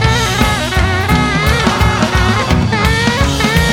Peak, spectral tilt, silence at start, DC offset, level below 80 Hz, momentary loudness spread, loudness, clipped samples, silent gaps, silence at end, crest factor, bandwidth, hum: 0 dBFS; -4.5 dB/octave; 0 s; under 0.1%; -20 dBFS; 1 LU; -12 LUFS; under 0.1%; none; 0 s; 12 dB; 18 kHz; none